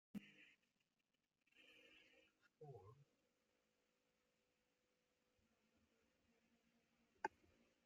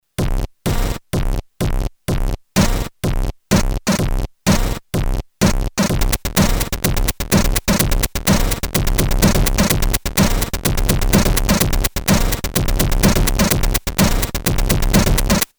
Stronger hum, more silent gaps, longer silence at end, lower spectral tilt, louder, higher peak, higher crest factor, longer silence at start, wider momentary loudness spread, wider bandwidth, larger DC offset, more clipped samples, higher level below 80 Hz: neither; neither; about the same, 0.1 s vs 0.15 s; about the same, -4 dB/octave vs -4.5 dB/octave; second, -58 LUFS vs -18 LUFS; second, -30 dBFS vs 0 dBFS; first, 34 dB vs 16 dB; about the same, 0.15 s vs 0.2 s; first, 16 LU vs 8 LU; second, 7.4 kHz vs over 20 kHz; neither; neither; second, under -90 dBFS vs -20 dBFS